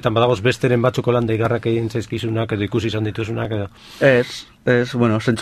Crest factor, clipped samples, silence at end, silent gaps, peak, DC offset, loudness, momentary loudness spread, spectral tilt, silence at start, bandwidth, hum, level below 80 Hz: 18 dB; under 0.1%; 0 s; none; -2 dBFS; under 0.1%; -19 LUFS; 8 LU; -6.5 dB/octave; 0.05 s; 13.5 kHz; none; -46 dBFS